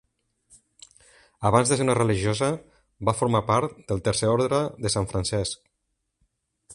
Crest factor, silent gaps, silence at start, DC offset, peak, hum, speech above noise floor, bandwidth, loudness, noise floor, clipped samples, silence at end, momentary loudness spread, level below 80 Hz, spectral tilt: 22 dB; none; 1.4 s; under 0.1%; -4 dBFS; none; 54 dB; 11.5 kHz; -24 LUFS; -78 dBFS; under 0.1%; 0 s; 8 LU; -48 dBFS; -5 dB/octave